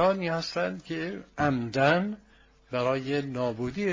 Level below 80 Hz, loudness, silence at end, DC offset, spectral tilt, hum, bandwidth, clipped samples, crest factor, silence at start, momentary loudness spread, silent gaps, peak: -56 dBFS; -29 LUFS; 0 s; under 0.1%; -6.5 dB/octave; none; 7.6 kHz; under 0.1%; 22 dB; 0 s; 11 LU; none; -6 dBFS